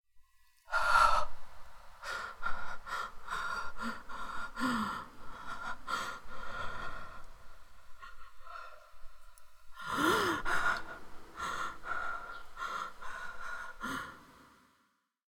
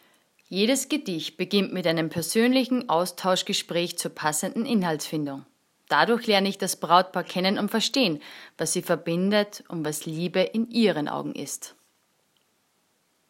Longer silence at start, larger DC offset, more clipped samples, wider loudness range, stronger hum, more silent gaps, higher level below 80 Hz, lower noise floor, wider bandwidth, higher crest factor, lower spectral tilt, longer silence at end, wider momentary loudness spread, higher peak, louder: second, 0.15 s vs 0.5 s; neither; neither; first, 10 LU vs 3 LU; neither; neither; first, -52 dBFS vs -76 dBFS; first, -76 dBFS vs -69 dBFS; about the same, 17 kHz vs 16.5 kHz; about the same, 22 dB vs 22 dB; about the same, -3 dB/octave vs -4 dB/octave; second, 0.9 s vs 1.6 s; first, 23 LU vs 10 LU; second, -14 dBFS vs -4 dBFS; second, -36 LUFS vs -25 LUFS